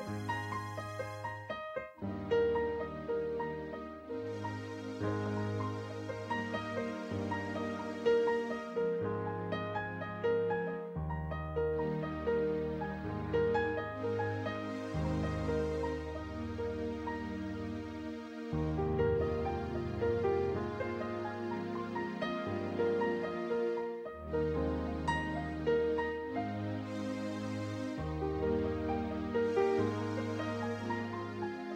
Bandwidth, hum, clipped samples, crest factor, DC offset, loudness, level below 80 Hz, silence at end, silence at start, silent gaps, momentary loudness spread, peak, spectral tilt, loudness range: 10.5 kHz; none; under 0.1%; 16 dB; under 0.1%; -36 LUFS; -52 dBFS; 0 s; 0 s; none; 9 LU; -18 dBFS; -7.5 dB/octave; 3 LU